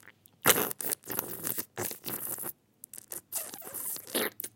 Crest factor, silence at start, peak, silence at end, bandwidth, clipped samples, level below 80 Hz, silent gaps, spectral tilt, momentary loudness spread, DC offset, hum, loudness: 30 dB; 0.05 s; -4 dBFS; 0.05 s; 17 kHz; under 0.1%; -72 dBFS; none; -1.5 dB/octave; 16 LU; under 0.1%; none; -32 LUFS